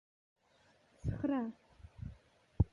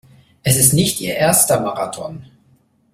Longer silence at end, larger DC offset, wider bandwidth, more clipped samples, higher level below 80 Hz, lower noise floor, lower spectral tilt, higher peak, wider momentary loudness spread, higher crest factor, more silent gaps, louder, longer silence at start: second, 0.05 s vs 0.7 s; neither; second, 7.2 kHz vs 16.5 kHz; neither; about the same, -48 dBFS vs -48 dBFS; first, -70 dBFS vs -56 dBFS; first, -10 dB/octave vs -3.5 dB/octave; second, -18 dBFS vs 0 dBFS; first, 19 LU vs 14 LU; first, 24 dB vs 18 dB; neither; second, -41 LUFS vs -15 LUFS; first, 1.05 s vs 0.45 s